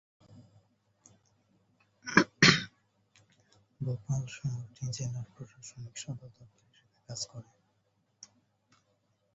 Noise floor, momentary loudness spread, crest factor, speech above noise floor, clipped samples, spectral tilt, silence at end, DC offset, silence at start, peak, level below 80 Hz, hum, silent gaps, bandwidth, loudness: -75 dBFS; 24 LU; 30 dB; 36 dB; under 0.1%; -3 dB/octave; 1.1 s; under 0.1%; 0.35 s; -6 dBFS; -64 dBFS; none; none; 8 kHz; -30 LUFS